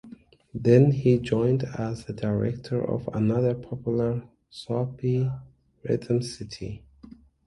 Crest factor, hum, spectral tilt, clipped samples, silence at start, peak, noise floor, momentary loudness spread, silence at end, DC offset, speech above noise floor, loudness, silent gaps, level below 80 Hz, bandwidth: 20 dB; none; -8.5 dB/octave; under 0.1%; 0.05 s; -6 dBFS; -50 dBFS; 18 LU; 0.7 s; under 0.1%; 25 dB; -26 LUFS; none; -54 dBFS; 11.5 kHz